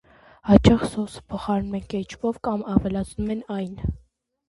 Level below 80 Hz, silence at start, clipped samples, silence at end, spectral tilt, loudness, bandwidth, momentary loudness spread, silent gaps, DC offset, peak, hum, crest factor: -38 dBFS; 0.45 s; under 0.1%; 0.5 s; -7.5 dB/octave; -24 LUFS; 11.5 kHz; 15 LU; none; under 0.1%; 0 dBFS; none; 24 dB